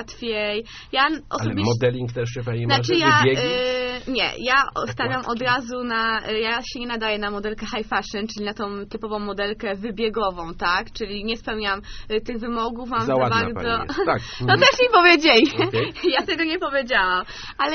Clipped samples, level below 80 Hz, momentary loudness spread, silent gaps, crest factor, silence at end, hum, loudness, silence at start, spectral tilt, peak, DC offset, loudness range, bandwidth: under 0.1%; -44 dBFS; 13 LU; none; 22 dB; 0 s; none; -21 LUFS; 0 s; -2.5 dB/octave; 0 dBFS; under 0.1%; 9 LU; 6.6 kHz